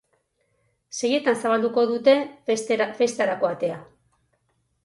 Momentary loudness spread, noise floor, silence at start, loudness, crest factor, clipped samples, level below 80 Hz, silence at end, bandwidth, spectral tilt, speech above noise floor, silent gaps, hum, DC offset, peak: 9 LU; -70 dBFS; 0.95 s; -23 LUFS; 18 dB; under 0.1%; -72 dBFS; 1 s; 11.5 kHz; -3.5 dB/octave; 48 dB; none; none; under 0.1%; -6 dBFS